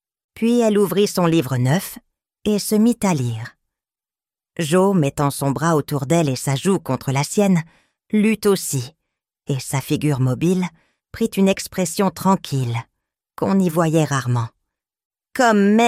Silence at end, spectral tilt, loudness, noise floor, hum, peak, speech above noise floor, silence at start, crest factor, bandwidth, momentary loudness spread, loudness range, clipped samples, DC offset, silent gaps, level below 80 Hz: 0 s; -6 dB/octave; -19 LUFS; under -90 dBFS; none; -2 dBFS; over 72 dB; 0.35 s; 18 dB; 16 kHz; 10 LU; 3 LU; under 0.1%; under 0.1%; 15.05-15.10 s; -54 dBFS